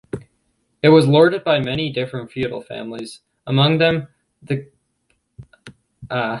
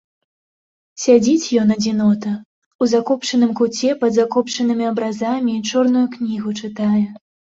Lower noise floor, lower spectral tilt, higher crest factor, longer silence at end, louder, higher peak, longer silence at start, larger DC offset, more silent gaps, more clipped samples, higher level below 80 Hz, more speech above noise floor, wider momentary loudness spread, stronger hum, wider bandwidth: second, -67 dBFS vs under -90 dBFS; first, -7 dB/octave vs -5 dB/octave; about the same, 18 dB vs 16 dB; second, 0 s vs 0.4 s; about the same, -18 LUFS vs -18 LUFS; about the same, -2 dBFS vs -2 dBFS; second, 0.15 s vs 0.95 s; neither; second, none vs 2.45-2.79 s; neither; first, -54 dBFS vs -60 dBFS; second, 50 dB vs over 73 dB; first, 19 LU vs 8 LU; neither; first, 11.5 kHz vs 7.8 kHz